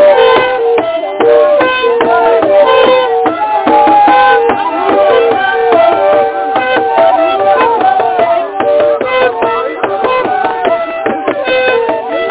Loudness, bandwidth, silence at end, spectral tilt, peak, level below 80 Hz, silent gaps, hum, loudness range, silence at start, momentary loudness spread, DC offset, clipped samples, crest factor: -9 LUFS; 4 kHz; 0 s; -7.5 dB/octave; 0 dBFS; -48 dBFS; none; none; 4 LU; 0 s; 7 LU; under 0.1%; 0.4%; 8 dB